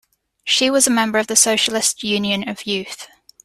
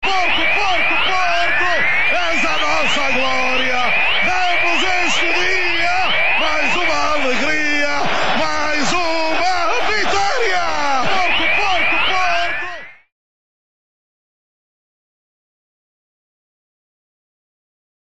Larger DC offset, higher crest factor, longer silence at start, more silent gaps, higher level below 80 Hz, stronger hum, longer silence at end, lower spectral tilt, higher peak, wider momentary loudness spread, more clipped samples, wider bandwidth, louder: second, under 0.1% vs 10%; first, 20 dB vs 12 dB; first, 0.45 s vs 0 s; neither; second, -60 dBFS vs -44 dBFS; neither; second, 0.4 s vs 4.9 s; about the same, -1.5 dB/octave vs -2 dB/octave; first, 0 dBFS vs -4 dBFS; first, 12 LU vs 3 LU; neither; first, 15.5 kHz vs 13 kHz; about the same, -16 LUFS vs -15 LUFS